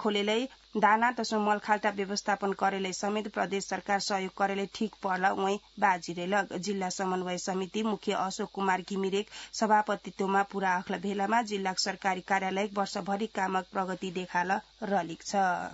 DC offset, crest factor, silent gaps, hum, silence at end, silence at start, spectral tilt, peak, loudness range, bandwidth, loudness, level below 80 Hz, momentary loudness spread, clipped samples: under 0.1%; 20 dB; none; none; 0 s; 0 s; -3 dB/octave; -10 dBFS; 3 LU; 8 kHz; -30 LUFS; -68 dBFS; 5 LU; under 0.1%